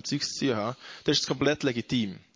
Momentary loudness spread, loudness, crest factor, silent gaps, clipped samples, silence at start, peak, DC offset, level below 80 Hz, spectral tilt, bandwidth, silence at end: 6 LU; -28 LUFS; 18 dB; none; under 0.1%; 0.05 s; -12 dBFS; under 0.1%; -60 dBFS; -4 dB/octave; 7.6 kHz; 0.15 s